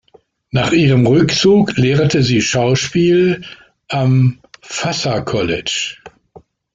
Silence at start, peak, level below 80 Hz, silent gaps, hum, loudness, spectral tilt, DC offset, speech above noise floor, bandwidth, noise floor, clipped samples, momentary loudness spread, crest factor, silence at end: 0.55 s; -2 dBFS; -46 dBFS; none; none; -14 LUFS; -5.5 dB/octave; under 0.1%; 38 dB; 7.8 kHz; -51 dBFS; under 0.1%; 11 LU; 12 dB; 0.65 s